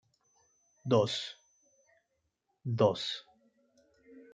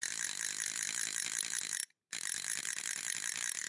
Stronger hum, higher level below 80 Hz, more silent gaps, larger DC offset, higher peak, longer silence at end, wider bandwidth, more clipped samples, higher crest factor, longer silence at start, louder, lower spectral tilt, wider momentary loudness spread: neither; first, -78 dBFS vs -88 dBFS; neither; neither; first, -14 dBFS vs -18 dBFS; about the same, 0.1 s vs 0 s; second, 9.2 kHz vs 12 kHz; neither; about the same, 22 dB vs 20 dB; first, 0.85 s vs 0 s; first, -32 LUFS vs -36 LUFS; first, -6 dB/octave vs 2.5 dB/octave; first, 16 LU vs 3 LU